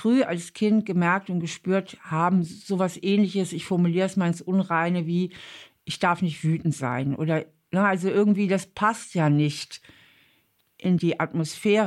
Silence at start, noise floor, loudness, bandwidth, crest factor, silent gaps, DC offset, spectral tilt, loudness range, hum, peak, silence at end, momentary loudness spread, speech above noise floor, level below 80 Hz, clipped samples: 0 s; -66 dBFS; -25 LUFS; 12.5 kHz; 14 dB; none; under 0.1%; -6.5 dB/octave; 2 LU; none; -10 dBFS; 0 s; 7 LU; 43 dB; -66 dBFS; under 0.1%